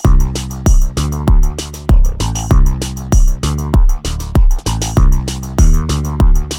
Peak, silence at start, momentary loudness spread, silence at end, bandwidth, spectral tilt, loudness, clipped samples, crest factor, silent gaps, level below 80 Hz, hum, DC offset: 0 dBFS; 0 s; 5 LU; 0 s; 16 kHz; -5.5 dB/octave; -15 LUFS; under 0.1%; 10 dB; none; -12 dBFS; none; under 0.1%